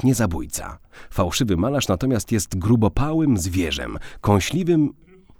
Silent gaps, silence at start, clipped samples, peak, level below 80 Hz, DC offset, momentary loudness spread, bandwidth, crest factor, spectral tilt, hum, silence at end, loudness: none; 0 s; under 0.1%; -4 dBFS; -36 dBFS; under 0.1%; 9 LU; 18 kHz; 18 dB; -5.5 dB/octave; none; 0.45 s; -21 LUFS